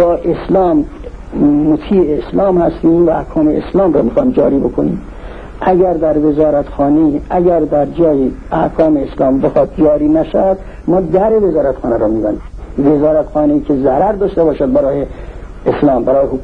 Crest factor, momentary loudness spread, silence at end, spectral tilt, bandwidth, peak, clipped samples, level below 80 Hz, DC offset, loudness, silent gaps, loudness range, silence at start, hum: 12 dB; 7 LU; 0 s; -10 dB/octave; 4.8 kHz; 0 dBFS; under 0.1%; -30 dBFS; 0.8%; -12 LUFS; none; 1 LU; 0 s; none